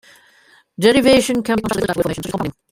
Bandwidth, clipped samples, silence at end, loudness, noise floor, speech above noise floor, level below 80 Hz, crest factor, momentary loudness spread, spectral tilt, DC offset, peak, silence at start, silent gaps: 16 kHz; under 0.1%; 0.2 s; -17 LUFS; -52 dBFS; 36 dB; -44 dBFS; 18 dB; 11 LU; -4.5 dB/octave; under 0.1%; 0 dBFS; 0.8 s; none